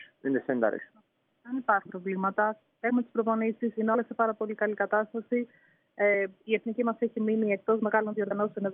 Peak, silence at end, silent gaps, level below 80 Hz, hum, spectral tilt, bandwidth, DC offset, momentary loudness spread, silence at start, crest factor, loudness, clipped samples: -10 dBFS; 0 s; none; -86 dBFS; none; -5.5 dB/octave; 3.7 kHz; under 0.1%; 5 LU; 0 s; 18 dB; -29 LUFS; under 0.1%